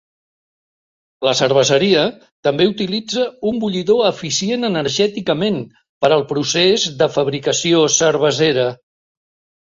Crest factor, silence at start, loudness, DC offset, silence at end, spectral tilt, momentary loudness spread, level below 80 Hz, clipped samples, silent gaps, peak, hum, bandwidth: 16 dB; 1.2 s; -16 LUFS; under 0.1%; 0.85 s; -3.5 dB/octave; 7 LU; -56 dBFS; under 0.1%; 2.32-2.43 s, 5.89-6.01 s; 0 dBFS; none; 7.8 kHz